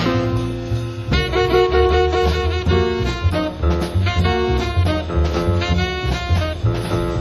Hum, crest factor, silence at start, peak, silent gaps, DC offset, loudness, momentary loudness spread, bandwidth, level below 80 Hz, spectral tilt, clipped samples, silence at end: none; 16 dB; 0 s; -2 dBFS; none; under 0.1%; -19 LUFS; 6 LU; 12.5 kHz; -24 dBFS; -6.5 dB/octave; under 0.1%; 0 s